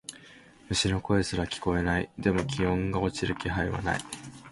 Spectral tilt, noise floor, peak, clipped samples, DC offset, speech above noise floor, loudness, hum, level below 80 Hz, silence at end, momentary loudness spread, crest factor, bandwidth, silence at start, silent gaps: -5 dB/octave; -53 dBFS; -10 dBFS; under 0.1%; under 0.1%; 24 dB; -29 LUFS; none; -44 dBFS; 0 s; 7 LU; 18 dB; 11.5 kHz; 0.1 s; none